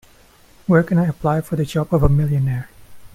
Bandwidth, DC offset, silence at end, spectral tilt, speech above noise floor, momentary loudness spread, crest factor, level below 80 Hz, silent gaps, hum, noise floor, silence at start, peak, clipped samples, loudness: 15.5 kHz; under 0.1%; 0.1 s; -8.5 dB/octave; 32 dB; 11 LU; 18 dB; -32 dBFS; none; none; -49 dBFS; 0.7 s; 0 dBFS; under 0.1%; -19 LUFS